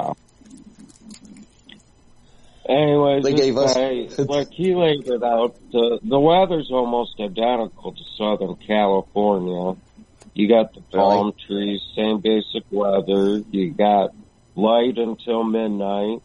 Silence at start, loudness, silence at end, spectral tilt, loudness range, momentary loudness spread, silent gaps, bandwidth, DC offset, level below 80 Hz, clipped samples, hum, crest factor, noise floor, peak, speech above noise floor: 0 s; -20 LUFS; 0.05 s; -6 dB/octave; 3 LU; 9 LU; none; 10.5 kHz; under 0.1%; -54 dBFS; under 0.1%; none; 16 dB; -51 dBFS; -4 dBFS; 32 dB